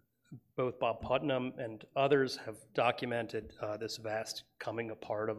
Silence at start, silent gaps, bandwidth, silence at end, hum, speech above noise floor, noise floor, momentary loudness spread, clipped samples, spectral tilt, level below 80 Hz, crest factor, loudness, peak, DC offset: 0.3 s; none; 15.5 kHz; 0 s; none; 21 dB; -56 dBFS; 11 LU; under 0.1%; -5 dB/octave; -66 dBFS; 20 dB; -36 LUFS; -16 dBFS; under 0.1%